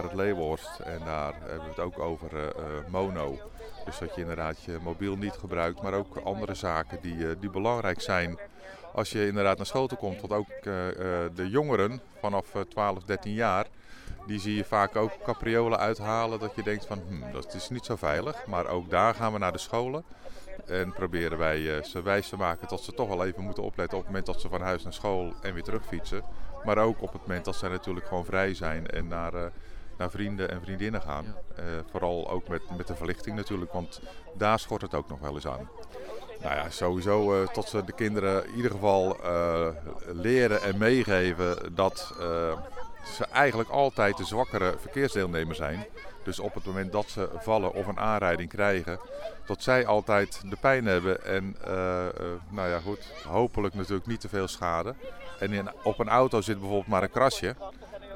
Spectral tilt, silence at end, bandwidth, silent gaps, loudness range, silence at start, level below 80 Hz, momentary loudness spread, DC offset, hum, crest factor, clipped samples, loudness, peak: -5.5 dB/octave; 0 s; 17 kHz; none; 7 LU; 0 s; -46 dBFS; 13 LU; under 0.1%; none; 22 dB; under 0.1%; -30 LUFS; -6 dBFS